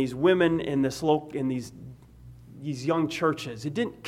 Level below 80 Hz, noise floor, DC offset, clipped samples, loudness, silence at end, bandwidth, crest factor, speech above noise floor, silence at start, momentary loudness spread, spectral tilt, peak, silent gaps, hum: -58 dBFS; -49 dBFS; under 0.1%; under 0.1%; -27 LUFS; 0 s; 15.5 kHz; 18 dB; 23 dB; 0 s; 16 LU; -6 dB/octave; -10 dBFS; none; none